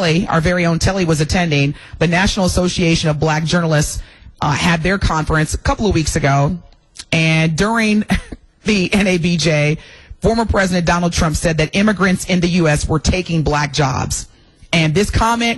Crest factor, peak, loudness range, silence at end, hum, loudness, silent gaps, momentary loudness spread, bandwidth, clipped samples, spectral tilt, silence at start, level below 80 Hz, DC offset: 10 dB; -4 dBFS; 1 LU; 0 s; none; -16 LUFS; none; 6 LU; 12.5 kHz; under 0.1%; -5 dB/octave; 0 s; -28 dBFS; under 0.1%